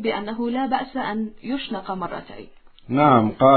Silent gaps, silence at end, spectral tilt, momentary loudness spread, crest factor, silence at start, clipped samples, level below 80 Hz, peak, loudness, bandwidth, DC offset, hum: none; 0 s; -11 dB/octave; 16 LU; 18 dB; 0 s; under 0.1%; -52 dBFS; -2 dBFS; -22 LUFS; 4.5 kHz; under 0.1%; none